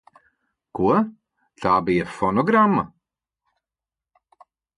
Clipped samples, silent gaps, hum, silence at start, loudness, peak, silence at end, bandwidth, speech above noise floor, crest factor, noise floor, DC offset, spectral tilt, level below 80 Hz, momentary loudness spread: under 0.1%; none; none; 0.75 s; -21 LUFS; -6 dBFS; 1.9 s; 11 kHz; 70 dB; 18 dB; -89 dBFS; under 0.1%; -8 dB/octave; -54 dBFS; 12 LU